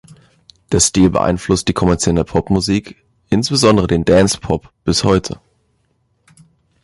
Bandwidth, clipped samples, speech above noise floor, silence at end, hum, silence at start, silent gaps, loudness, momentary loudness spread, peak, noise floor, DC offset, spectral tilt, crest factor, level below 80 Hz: 11.5 kHz; under 0.1%; 48 dB; 1.5 s; none; 0.7 s; none; -15 LUFS; 8 LU; 0 dBFS; -62 dBFS; under 0.1%; -5 dB/octave; 16 dB; -34 dBFS